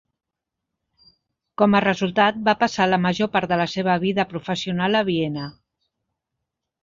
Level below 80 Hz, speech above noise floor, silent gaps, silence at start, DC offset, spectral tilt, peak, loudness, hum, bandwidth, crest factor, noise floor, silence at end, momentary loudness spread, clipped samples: -58 dBFS; 63 dB; none; 1.6 s; under 0.1%; -6 dB/octave; -4 dBFS; -21 LUFS; none; 7.6 kHz; 20 dB; -83 dBFS; 1.3 s; 8 LU; under 0.1%